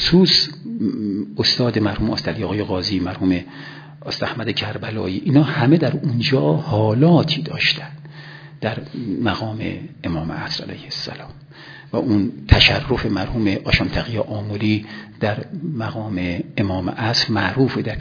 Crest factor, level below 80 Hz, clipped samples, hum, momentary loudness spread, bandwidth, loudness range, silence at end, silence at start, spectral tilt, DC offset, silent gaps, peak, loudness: 20 dB; -36 dBFS; under 0.1%; none; 14 LU; 5.4 kHz; 7 LU; 0 s; 0 s; -6 dB/octave; under 0.1%; none; 0 dBFS; -19 LUFS